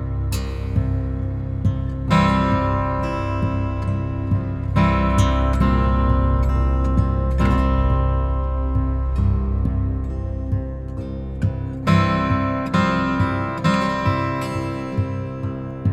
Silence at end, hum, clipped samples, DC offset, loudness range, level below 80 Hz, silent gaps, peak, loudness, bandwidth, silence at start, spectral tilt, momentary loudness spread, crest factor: 0 s; none; under 0.1%; under 0.1%; 3 LU; -24 dBFS; none; -4 dBFS; -21 LUFS; 11 kHz; 0 s; -7.5 dB/octave; 8 LU; 16 dB